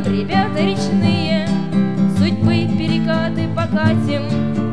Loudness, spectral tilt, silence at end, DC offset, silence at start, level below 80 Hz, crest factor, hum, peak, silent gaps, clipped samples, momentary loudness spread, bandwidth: -17 LUFS; -7 dB/octave; 0 s; 3%; 0 s; -46 dBFS; 14 dB; none; -2 dBFS; none; under 0.1%; 3 LU; 11 kHz